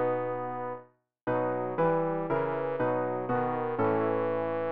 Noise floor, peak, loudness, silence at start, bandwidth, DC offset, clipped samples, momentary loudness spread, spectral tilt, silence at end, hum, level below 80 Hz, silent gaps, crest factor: -55 dBFS; -16 dBFS; -30 LUFS; 0 s; 4.4 kHz; 0.3%; under 0.1%; 8 LU; -7 dB/octave; 0 s; none; -66 dBFS; 1.23-1.27 s; 14 dB